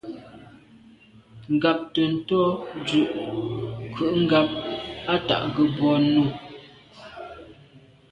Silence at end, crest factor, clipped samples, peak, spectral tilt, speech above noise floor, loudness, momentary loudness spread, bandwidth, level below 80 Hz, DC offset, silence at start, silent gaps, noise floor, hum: 0.35 s; 20 dB; under 0.1%; -6 dBFS; -7 dB/octave; 29 dB; -23 LUFS; 21 LU; 8.8 kHz; -56 dBFS; under 0.1%; 0.05 s; none; -52 dBFS; none